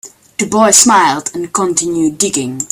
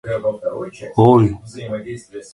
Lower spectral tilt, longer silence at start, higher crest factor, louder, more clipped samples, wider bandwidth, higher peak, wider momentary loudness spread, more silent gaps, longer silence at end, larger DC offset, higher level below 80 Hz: second, -2.5 dB/octave vs -8.5 dB/octave; about the same, 0.05 s vs 0.05 s; second, 12 dB vs 18 dB; first, -11 LUFS vs -17 LUFS; first, 0.2% vs under 0.1%; first, over 20 kHz vs 11.5 kHz; about the same, 0 dBFS vs 0 dBFS; second, 12 LU vs 19 LU; neither; about the same, 0.05 s vs 0.1 s; neither; second, -52 dBFS vs -46 dBFS